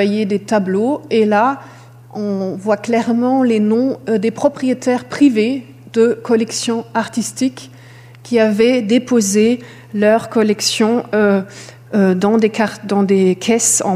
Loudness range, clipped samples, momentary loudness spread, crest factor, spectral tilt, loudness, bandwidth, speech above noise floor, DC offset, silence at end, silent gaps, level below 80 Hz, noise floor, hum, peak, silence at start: 2 LU; under 0.1%; 8 LU; 14 dB; -4.5 dB/octave; -15 LUFS; 15.5 kHz; 24 dB; under 0.1%; 0 s; none; -62 dBFS; -39 dBFS; none; -2 dBFS; 0 s